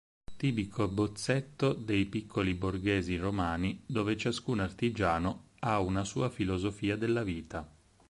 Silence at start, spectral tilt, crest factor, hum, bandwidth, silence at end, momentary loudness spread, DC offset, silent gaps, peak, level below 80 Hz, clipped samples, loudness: 0.3 s; -6 dB/octave; 18 dB; none; 11.5 kHz; 0.4 s; 4 LU; under 0.1%; none; -14 dBFS; -50 dBFS; under 0.1%; -33 LUFS